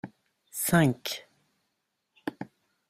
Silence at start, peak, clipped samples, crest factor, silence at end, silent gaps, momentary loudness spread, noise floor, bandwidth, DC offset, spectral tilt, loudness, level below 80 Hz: 0.05 s; -8 dBFS; under 0.1%; 22 dB; 0.45 s; none; 22 LU; -80 dBFS; 16 kHz; under 0.1%; -5 dB/octave; -28 LUFS; -64 dBFS